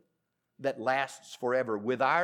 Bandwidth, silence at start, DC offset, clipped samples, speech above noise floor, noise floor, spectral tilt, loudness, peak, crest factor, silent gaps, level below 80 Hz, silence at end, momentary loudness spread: 14 kHz; 0.6 s; under 0.1%; under 0.1%; 51 dB; -81 dBFS; -4.5 dB/octave; -31 LUFS; -12 dBFS; 18 dB; none; under -90 dBFS; 0 s; 8 LU